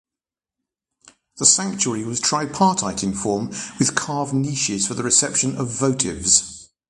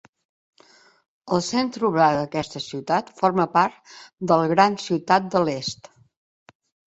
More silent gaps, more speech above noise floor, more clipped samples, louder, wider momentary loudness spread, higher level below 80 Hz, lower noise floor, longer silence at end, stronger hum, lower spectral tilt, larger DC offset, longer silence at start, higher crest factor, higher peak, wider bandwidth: neither; first, 69 dB vs 33 dB; neither; first, -19 LUFS vs -22 LUFS; second, 8 LU vs 11 LU; first, -52 dBFS vs -62 dBFS; first, -90 dBFS vs -55 dBFS; second, 0.25 s vs 1.15 s; neither; second, -3 dB/octave vs -5 dB/octave; neither; about the same, 1.35 s vs 1.25 s; about the same, 22 dB vs 22 dB; about the same, 0 dBFS vs -2 dBFS; first, 11.5 kHz vs 8.2 kHz